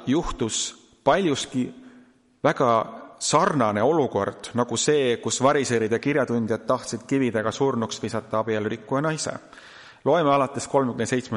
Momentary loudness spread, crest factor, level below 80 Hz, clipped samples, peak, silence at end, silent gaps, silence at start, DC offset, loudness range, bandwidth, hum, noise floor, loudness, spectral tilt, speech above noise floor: 8 LU; 18 dB; -50 dBFS; under 0.1%; -4 dBFS; 0 s; none; 0 s; under 0.1%; 3 LU; 11.5 kHz; none; -54 dBFS; -24 LUFS; -4.5 dB/octave; 31 dB